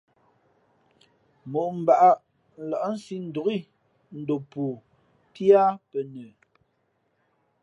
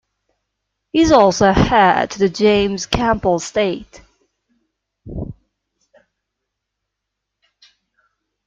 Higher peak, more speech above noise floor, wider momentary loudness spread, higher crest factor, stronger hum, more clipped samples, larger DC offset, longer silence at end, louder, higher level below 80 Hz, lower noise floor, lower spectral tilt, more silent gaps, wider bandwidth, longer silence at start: second, -6 dBFS vs 0 dBFS; second, 48 dB vs 65 dB; about the same, 19 LU vs 19 LU; about the same, 20 dB vs 18 dB; neither; neither; neither; second, 1.35 s vs 3.15 s; second, -24 LUFS vs -15 LUFS; second, -76 dBFS vs -38 dBFS; second, -72 dBFS vs -79 dBFS; first, -7.5 dB/octave vs -5 dB/octave; neither; first, 10.5 kHz vs 9.2 kHz; first, 1.45 s vs 0.95 s